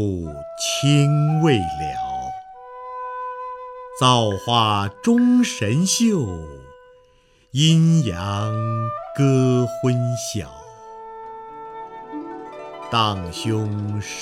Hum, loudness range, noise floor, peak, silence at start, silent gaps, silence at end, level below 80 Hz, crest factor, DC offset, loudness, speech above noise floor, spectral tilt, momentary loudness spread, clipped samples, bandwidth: none; 8 LU; -56 dBFS; -2 dBFS; 0 s; none; 0 s; -50 dBFS; 20 dB; under 0.1%; -20 LUFS; 37 dB; -5.5 dB/octave; 20 LU; under 0.1%; 14.5 kHz